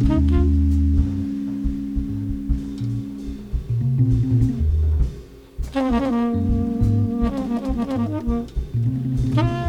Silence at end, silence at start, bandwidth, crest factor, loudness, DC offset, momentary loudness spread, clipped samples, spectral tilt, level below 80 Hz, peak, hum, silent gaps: 0 s; 0 s; 8.2 kHz; 14 dB; -22 LUFS; under 0.1%; 9 LU; under 0.1%; -9 dB/octave; -26 dBFS; -6 dBFS; none; none